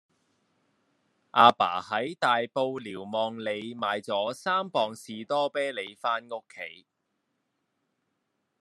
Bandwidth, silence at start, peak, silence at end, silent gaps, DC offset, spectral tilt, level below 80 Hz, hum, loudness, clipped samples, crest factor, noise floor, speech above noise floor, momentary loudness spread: 12.5 kHz; 1.35 s; -4 dBFS; 1.85 s; none; under 0.1%; -4 dB/octave; -82 dBFS; none; -27 LUFS; under 0.1%; 26 dB; -79 dBFS; 51 dB; 18 LU